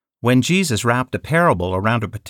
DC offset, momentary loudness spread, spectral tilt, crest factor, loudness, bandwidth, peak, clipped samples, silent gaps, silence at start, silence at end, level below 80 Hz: under 0.1%; 4 LU; -5.5 dB/octave; 14 dB; -18 LUFS; 17.5 kHz; -4 dBFS; under 0.1%; none; 0.25 s; 0 s; -48 dBFS